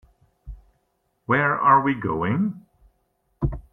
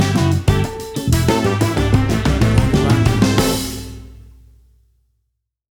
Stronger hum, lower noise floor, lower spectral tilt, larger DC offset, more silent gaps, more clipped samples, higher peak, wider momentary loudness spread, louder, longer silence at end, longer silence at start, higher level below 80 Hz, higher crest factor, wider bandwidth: neither; about the same, -71 dBFS vs -72 dBFS; first, -9.5 dB/octave vs -6 dB/octave; neither; neither; neither; second, -4 dBFS vs 0 dBFS; first, 14 LU vs 10 LU; second, -21 LUFS vs -16 LUFS; second, 0.15 s vs 1.6 s; first, 0.45 s vs 0 s; second, -42 dBFS vs -26 dBFS; about the same, 20 dB vs 16 dB; second, 3.9 kHz vs 19.5 kHz